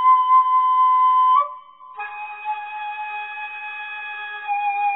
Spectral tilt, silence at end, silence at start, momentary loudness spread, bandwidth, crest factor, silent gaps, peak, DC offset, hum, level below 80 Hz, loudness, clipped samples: -1 dB/octave; 0 s; 0 s; 16 LU; 4 kHz; 14 dB; none; -6 dBFS; under 0.1%; none; -80 dBFS; -20 LUFS; under 0.1%